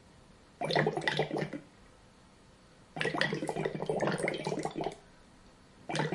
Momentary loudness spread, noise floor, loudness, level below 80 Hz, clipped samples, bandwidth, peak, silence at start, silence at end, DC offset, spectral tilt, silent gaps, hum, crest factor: 11 LU; -59 dBFS; -34 LUFS; -66 dBFS; under 0.1%; 11.5 kHz; -10 dBFS; 0.05 s; 0 s; under 0.1%; -5 dB/octave; none; none; 26 dB